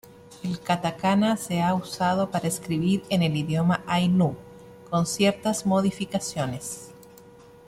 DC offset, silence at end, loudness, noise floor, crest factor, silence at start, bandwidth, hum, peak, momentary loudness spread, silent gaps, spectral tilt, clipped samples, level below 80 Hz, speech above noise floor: under 0.1%; 0.65 s; -25 LUFS; -49 dBFS; 18 dB; 0.25 s; 16 kHz; none; -8 dBFS; 10 LU; none; -5.5 dB/octave; under 0.1%; -58 dBFS; 25 dB